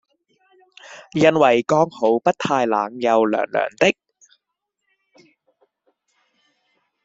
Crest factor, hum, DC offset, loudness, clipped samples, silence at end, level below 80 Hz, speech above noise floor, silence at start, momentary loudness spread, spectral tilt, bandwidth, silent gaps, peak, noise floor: 20 dB; none; under 0.1%; -18 LUFS; under 0.1%; 3.15 s; -62 dBFS; 61 dB; 0.9 s; 12 LU; -5.5 dB/octave; 7.8 kHz; none; -2 dBFS; -79 dBFS